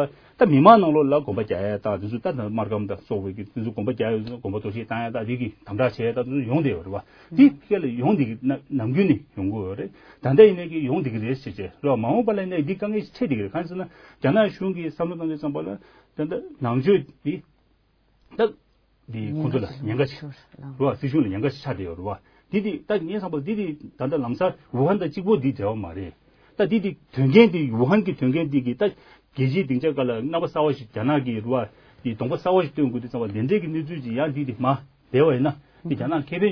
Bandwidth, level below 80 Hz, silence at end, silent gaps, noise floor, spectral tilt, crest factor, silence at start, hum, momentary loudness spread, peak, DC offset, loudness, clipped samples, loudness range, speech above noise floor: 5.4 kHz; -58 dBFS; 0 s; none; -63 dBFS; -9.5 dB/octave; 22 dB; 0 s; none; 12 LU; 0 dBFS; under 0.1%; -23 LUFS; under 0.1%; 6 LU; 41 dB